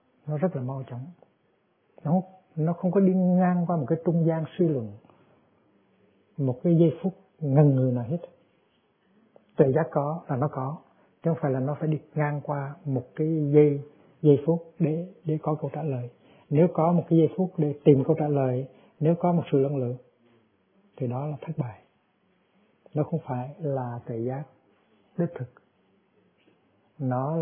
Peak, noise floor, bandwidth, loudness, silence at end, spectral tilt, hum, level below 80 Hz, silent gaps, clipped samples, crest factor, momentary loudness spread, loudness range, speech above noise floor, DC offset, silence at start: -4 dBFS; -68 dBFS; 3.6 kHz; -26 LUFS; 0 s; -13 dB/octave; none; -70 dBFS; none; under 0.1%; 22 dB; 14 LU; 10 LU; 44 dB; under 0.1%; 0.25 s